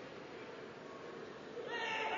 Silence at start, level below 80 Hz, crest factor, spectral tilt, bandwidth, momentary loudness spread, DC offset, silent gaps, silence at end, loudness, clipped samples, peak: 0 s; -80 dBFS; 18 dB; -1 dB/octave; 7.4 kHz; 11 LU; under 0.1%; none; 0 s; -45 LUFS; under 0.1%; -26 dBFS